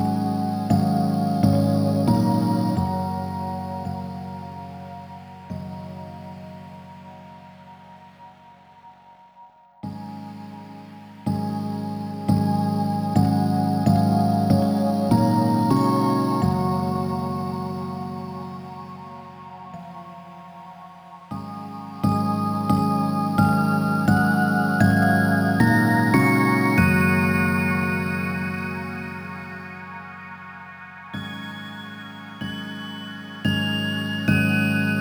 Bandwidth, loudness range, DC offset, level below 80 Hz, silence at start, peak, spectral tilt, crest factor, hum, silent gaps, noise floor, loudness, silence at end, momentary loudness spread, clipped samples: over 20 kHz; 19 LU; under 0.1%; -52 dBFS; 0 s; -6 dBFS; -7 dB/octave; 18 dB; none; none; -50 dBFS; -22 LUFS; 0 s; 20 LU; under 0.1%